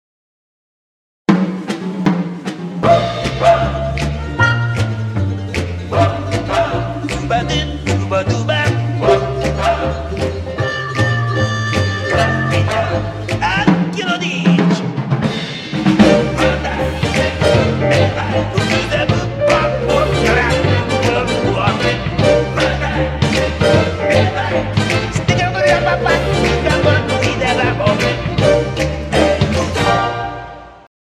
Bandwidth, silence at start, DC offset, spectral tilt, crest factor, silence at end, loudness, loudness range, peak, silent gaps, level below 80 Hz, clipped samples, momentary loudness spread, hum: 13 kHz; 1.3 s; under 0.1%; -6 dB/octave; 16 dB; 0.3 s; -15 LUFS; 3 LU; 0 dBFS; none; -30 dBFS; under 0.1%; 7 LU; none